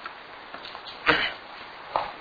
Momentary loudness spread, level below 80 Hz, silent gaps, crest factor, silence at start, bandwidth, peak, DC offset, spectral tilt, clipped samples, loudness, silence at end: 18 LU; -58 dBFS; none; 28 dB; 0 s; 5 kHz; -2 dBFS; under 0.1%; -4.5 dB/octave; under 0.1%; -27 LUFS; 0 s